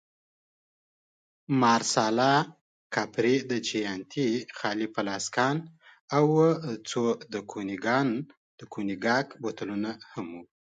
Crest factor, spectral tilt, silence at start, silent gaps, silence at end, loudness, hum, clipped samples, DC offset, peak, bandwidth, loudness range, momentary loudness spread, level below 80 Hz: 20 dB; -4.5 dB/octave; 1.5 s; 2.61-2.90 s, 6.01-6.08 s, 8.37-8.58 s; 0.15 s; -28 LUFS; none; under 0.1%; under 0.1%; -10 dBFS; 9.4 kHz; 4 LU; 12 LU; -72 dBFS